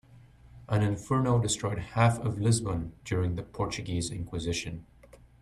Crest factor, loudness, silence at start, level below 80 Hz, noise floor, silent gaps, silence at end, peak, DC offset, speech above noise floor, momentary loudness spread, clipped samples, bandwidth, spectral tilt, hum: 20 dB; -30 LUFS; 0.1 s; -50 dBFS; -54 dBFS; none; 0.25 s; -10 dBFS; under 0.1%; 26 dB; 8 LU; under 0.1%; 12.5 kHz; -5.5 dB/octave; none